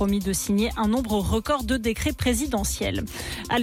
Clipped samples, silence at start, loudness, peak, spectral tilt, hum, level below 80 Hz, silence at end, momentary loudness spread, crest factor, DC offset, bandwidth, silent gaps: under 0.1%; 0 s; -25 LUFS; -12 dBFS; -4.5 dB/octave; none; -36 dBFS; 0 s; 5 LU; 12 dB; under 0.1%; 17 kHz; none